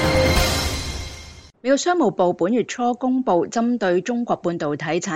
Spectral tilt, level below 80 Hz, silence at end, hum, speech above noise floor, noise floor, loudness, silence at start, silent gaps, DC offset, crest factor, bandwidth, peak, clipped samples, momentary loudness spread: -5 dB/octave; -34 dBFS; 0 s; none; 21 dB; -41 dBFS; -21 LUFS; 0 s; none; under 0.1%; 14 dB; 16 kHz; -6 dBFS; under 0.1%; 10 LU